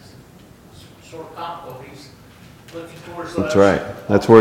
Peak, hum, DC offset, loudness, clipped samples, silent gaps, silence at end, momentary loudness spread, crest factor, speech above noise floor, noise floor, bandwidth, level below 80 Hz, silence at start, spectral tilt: 0 dBFS; none; under 0.1%; -18 LUFS; under 0.1%; none; 0 s; 23 LU; 20 dB; 27 dB; -45 dBFS; 16.5 kHz; -50 dBFS; 1.1 s; -6.5 dB/octave